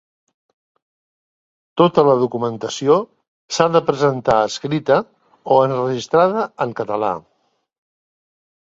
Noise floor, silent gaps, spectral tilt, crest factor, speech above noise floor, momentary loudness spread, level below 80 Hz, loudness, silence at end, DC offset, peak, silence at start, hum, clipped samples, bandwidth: under -90 dBFS; 3.28-3.49 s; -5.5 dB/octave; 18 dB; over 73 dB; 9 LU; -58 dBFS; -17 LUFS; 1.45 s; under 0.1%; 0 dBFS; 1.75 s; none; under 0.1%; 7.8 kHz